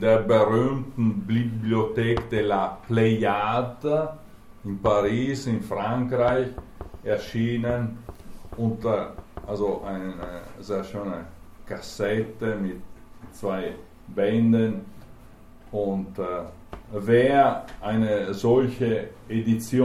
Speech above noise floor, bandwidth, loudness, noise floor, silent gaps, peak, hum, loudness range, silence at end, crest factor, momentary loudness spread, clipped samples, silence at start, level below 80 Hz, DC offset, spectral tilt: 23 dB; 14.5 kHz; -25 LUFS; -47 dBFS; none; -6 dBFS; none; 7 LU; 0 s; 18 dB; 16 LU; under 0.1%; 0 s; -46 dBFS; under 0.1%; -7.5 dB/octave